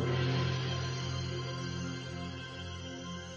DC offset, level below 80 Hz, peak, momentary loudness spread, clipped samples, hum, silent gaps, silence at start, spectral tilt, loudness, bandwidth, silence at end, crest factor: under 0.1%; -50 dBFS; -22 dBFS; 10 LU; under 0.1%; none; none; 0 s; -5.5 dB/octave; -37 LUFS; 8 kHz; 0 s; 14 dB